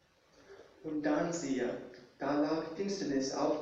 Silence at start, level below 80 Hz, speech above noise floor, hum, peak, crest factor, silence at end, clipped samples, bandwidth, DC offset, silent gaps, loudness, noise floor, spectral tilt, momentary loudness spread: 0.5 s; -70 dBFS; 30 dB; none; -20 dBFS; 16 dB; 0 s; under 0.1%; 8.2 kHz; under 0.1%; none; -35 LUFS; -64 dBFS; -5 dB/octave; 10 LU